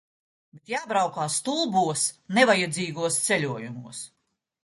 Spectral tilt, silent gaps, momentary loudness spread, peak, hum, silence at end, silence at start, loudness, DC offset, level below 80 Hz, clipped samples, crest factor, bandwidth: -3 dB/octave; none; 17 LU; -4 dBFS; none; 0.55 s; 0.55 s; -24 LUFS; under 0.1%; -70 dBFS; under 0.1%; 22 dB; 12 kHz